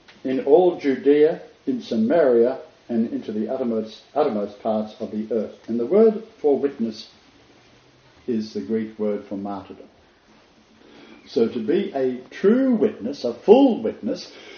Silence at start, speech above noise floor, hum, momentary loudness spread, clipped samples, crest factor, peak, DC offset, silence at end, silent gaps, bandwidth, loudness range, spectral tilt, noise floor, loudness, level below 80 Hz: 0.25 s; 34 dB; none; 13 LU; under 0.1%; 22 dB; 0 dBFS; under 0.1%; 0 s; none; 6.8 kHz; 10 LU; -6 dB/octave; -54 dBFS; -22 LUFS; -68 dBFS